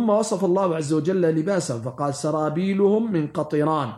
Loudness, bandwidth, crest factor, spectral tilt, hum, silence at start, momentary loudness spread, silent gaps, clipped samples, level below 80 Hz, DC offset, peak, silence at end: -22 LUFS; 12.5 kHz; 14 dB; -6.5 dB/octave; none; 0 s; 5 LU; none; under 0.1%; -66 dBFS; under 0.1%; -8 dBFS; 0 s